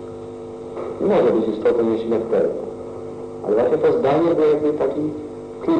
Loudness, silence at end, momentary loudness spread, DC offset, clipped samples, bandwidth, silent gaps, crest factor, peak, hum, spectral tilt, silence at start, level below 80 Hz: -19 LUFS; 0 s; 15 LU; under 0.1%; under 0.1%; 9 kHz; none; 12 dB; -8 dBFS; none; -8 dB/octave; 0 s; -54 dBFS